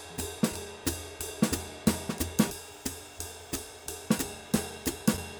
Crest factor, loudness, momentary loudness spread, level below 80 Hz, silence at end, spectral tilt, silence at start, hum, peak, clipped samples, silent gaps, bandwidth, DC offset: 22 dB; -32 LUFS; 9 LU; -50 dBFS; 0 s; -4 dB/octave; 0 s; none; -10 dBFS; under 0.1%; none; over 20 kHz; under 0.1%